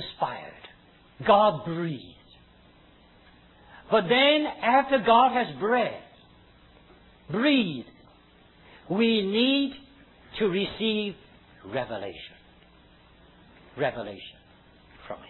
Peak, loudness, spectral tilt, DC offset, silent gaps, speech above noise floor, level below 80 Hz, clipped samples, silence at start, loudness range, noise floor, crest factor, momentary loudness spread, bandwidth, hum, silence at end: -6 dBFS; -25 LUFS; -8 dB/octave; under 0.1%; none; 32 dB; -60 dBFS; under 0.1%; 0 s; 13 LU; -56 dBFS; 22 dB; 22 LU; 4.3 kHz; none; 0.05 s